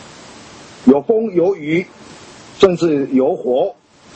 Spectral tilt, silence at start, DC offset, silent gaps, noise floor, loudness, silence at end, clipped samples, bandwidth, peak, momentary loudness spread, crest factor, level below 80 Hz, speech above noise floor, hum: -6.5 dB/octave; 0 s; under 0.1%; none; -39 dBFS; -16 LUFS; 0.45 s; under 0.1%; 8.6 kHz; 0 dBFS; 8 LU; 16 dB; -52 dBFS; 24 dB; none